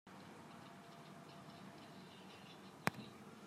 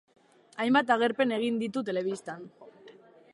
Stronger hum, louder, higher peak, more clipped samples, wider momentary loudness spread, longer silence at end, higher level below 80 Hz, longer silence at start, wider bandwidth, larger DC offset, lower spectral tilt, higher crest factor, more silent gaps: neither; second, -52 LUFS vs -28 LUFS; second, -14 dBFS vs -10 dBFS; neither; second, 13 LU vs 20 LU; second, 0 s vs 0.4 s; second, -88 dBFS vs -80 dBFS; second, 0.05 s vs 0.55 s; first, 15.5 kHz vs 11.5 kHz; neither; about the same, -4.5 dB/octave vs -5 dB/octave; first, 38 dB vs 20 dB; neither